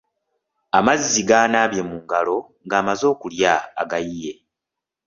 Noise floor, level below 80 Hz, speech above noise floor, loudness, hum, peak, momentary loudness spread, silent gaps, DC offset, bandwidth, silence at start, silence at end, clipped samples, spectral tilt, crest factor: -85 dBFS; -56 dBFS; 66 dB; -19 LUFS; none; -2 dBFS; 11 LU; none; under 0.1%; 7.6 kHz; 0.75 s; 0.75 s; under 0.1%; -3 dB/octave; 20 dB